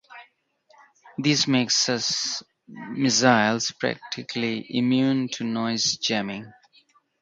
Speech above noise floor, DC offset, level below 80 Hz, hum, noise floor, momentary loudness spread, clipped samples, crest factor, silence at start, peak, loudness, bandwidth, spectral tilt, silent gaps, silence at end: 38 dB; under 0.1%; -68 dBFS; none; -62 dBFS; 14 LU; under 0.1%; 22 dB; 0.1 s; -4 dBFS; -23 LUFS; 9.4 kHz; -3 dB/octave; none; 0.7 s